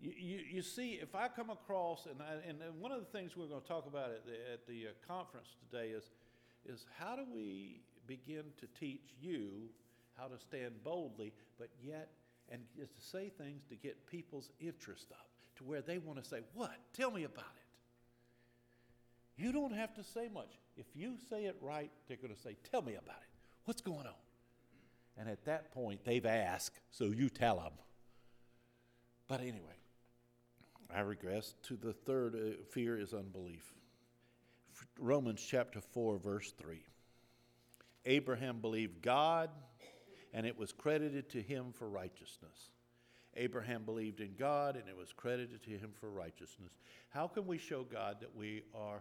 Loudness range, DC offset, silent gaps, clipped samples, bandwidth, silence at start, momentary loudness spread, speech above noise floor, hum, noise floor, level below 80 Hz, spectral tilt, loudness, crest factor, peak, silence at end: 11 LU; under 0.1%; none; under 0.1%; 19.5 kHz; 0 s; 19 LU; 29 dB; none; -73 dBFS; -78 dBFS; -5.5 dB/octave; -44 LUFS; 24 dB; -20 dBFS; 0 s